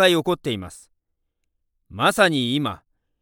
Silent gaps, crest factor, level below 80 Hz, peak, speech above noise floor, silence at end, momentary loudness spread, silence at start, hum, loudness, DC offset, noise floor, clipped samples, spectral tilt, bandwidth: none; 22 dB; -58 dBFS; -2 dBFS; 54 dB; 0.45 s; 22 LU; 0 s; none; -21 LUFS; under 0.1%; -75 dBFS; under 0.1%; -4.5 dB/octave; 19 kHz